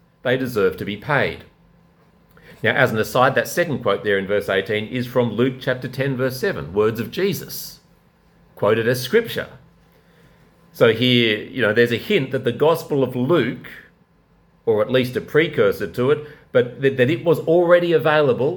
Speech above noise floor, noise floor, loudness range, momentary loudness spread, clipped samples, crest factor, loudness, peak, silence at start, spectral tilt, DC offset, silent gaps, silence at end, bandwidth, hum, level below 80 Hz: 38 dB; -57 dBFS; 5 LU; 8 LU; under 0.1%; 20 dB; -19 LUFS; 0 dBFS; 0.25 s; -5.5 dB/octave; under 0.1%; none; 0 s; 19 kHz; none; -56 dBFS